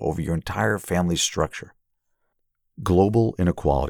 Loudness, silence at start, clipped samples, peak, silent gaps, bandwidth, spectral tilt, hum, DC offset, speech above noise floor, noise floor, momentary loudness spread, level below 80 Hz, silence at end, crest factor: -23 LUFS; 0 s; under 0.1%; -6 dBFS; none; 18.5 kHz; -5 dB/octave; none; under 0.1%; 51 dB; -73 dBFS; 8 LU; -38 dBFS; 0 s; 18 dB